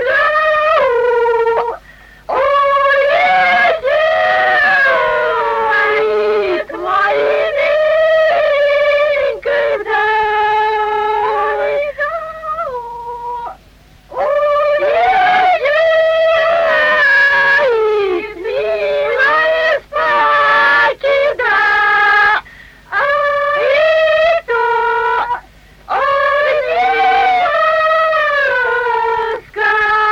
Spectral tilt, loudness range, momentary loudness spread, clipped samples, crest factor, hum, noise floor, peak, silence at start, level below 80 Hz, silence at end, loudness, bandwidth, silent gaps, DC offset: -3.5 dB/octave; 4 LU; 9 LU; under 0.1%; 10 dB; none; -44 dBFS; -4 dBFS; 0 s; -46 dBFS; 0 s; -12 LUFS; 12.5 kHz; none; under 0.1%